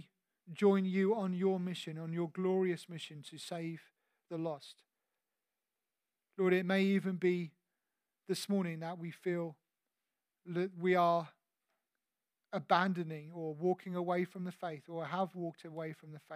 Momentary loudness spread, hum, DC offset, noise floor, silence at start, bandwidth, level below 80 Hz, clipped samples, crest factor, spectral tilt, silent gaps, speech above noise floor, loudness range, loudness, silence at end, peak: 15 LU; none; under 0.1%; under -90 dBFS; 0.45 s; 14.5 kHz; under -90 dBFS; under 0.1%; 22 dB; -6.5 dB/octave; none; over 55 dB; 6 LU; -36 LUFS; 0 s; -14 dBFS